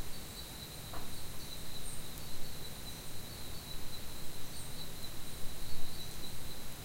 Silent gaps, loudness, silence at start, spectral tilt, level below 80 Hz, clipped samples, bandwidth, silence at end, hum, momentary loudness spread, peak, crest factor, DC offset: none; -45 LUFS; 0 s; -3 dB/octave; -48 dBFS; under 0.1%; 16 kHz; 0 s; none; 1 LU; -18 dBFS; 16 dB; under 0.1%